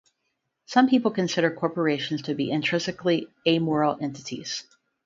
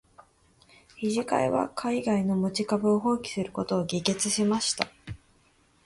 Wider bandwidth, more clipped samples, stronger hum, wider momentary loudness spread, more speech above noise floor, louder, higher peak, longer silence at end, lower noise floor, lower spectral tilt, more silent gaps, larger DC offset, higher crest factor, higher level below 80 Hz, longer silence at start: second, 7.6 kHz vs 11.5 kHz; neither; neither; first, 11 LU vs 8 LU; first, 53 dB vs 37 dB; about the same, -25 LUFS vs -27 LUFS; about the same, -6 dBFS vs -6 dBFS; second, 0.45 s vs 0.7 s; first, -78 dBFS vs -64 dBFS; about the same, -5 dB/octave vs -4.5 dB/octave; neither; neither; about the same, 20 dB vs 22 dB; second, -68 dBFS vs -60 dBFS; first, 0.7 s vs 0.2 s